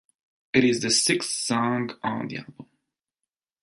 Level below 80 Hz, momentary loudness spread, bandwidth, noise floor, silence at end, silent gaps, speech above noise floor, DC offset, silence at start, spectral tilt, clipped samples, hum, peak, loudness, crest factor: -64 dBFS; 11 LU; 12 kHz; -87 dBFS; 1 s; none; 63 dB; under 0.1%; 0.55 s; -3 dB/octave; under 0.1%; none; -6 dBFS; -23 LUFS; 20 dB